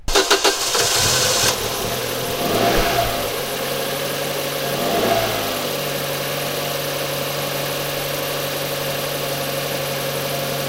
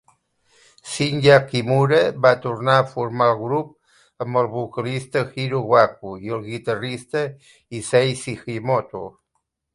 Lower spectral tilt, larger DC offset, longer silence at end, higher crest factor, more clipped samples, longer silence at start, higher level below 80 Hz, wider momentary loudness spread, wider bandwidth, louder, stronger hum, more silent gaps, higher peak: second, -2.5 dB/octave vs -5.5 dB/octave; neither; second, 0 s vs 0.65 s; about the same, 20 dB vs 20 dB; neither; second, 0 s vs 0.85 s; first, -38 dBFS vs -58 dBFS; second, 7 LU vs 15 LU; first, 16 kHz vs 11.5 kHz; about the same, -20 LUFS vs -20 LUFS; neither; neither; about the same, -2 dBFS vs 0 dBFS